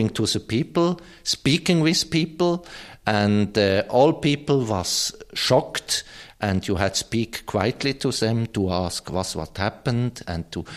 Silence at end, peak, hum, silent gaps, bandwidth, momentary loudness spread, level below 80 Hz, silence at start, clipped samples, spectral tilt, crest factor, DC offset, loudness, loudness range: 0 s; -4 dBFS; none; none; 14.5 kHz; 9 LU; -50 dBFS; 0 s; under 0.1%; -4.5 dB/octave; 18 dB; under 0.1%; -23 LUFS; 4 LU